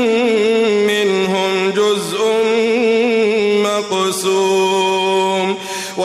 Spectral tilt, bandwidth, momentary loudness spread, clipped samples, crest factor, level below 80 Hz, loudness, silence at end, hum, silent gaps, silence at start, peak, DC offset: -3.5 dB/octave; 15.5 kHz; 3 LU; under 0.1%; 10 dB; -62 dBFS; -15 LUFS; 0 s; none; none; 0 s; -6 dBFS; under 0.1%